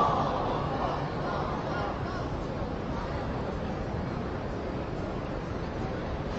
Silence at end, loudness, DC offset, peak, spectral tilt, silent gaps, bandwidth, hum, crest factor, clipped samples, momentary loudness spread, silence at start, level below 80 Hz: 0 s; -33 LUFS; under 0.1%; -14 dBFS; -6 dB/octave; none; 8 kHz; none; 18 dB; under 0.1%; 4 LU; 0 s; -42 dBFS